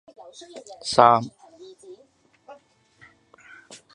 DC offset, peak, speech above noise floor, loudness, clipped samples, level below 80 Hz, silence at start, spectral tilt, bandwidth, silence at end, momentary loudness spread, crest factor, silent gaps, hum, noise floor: under 0.1%; 0 dBFS; 38 dB; -19 LUFS; under 0.1%; -66 dBFS; 0.55 s; -4 dB/octave; 11 kHz; 1.4 s; 29 LU; 26 dB; none; none; -59 dBFS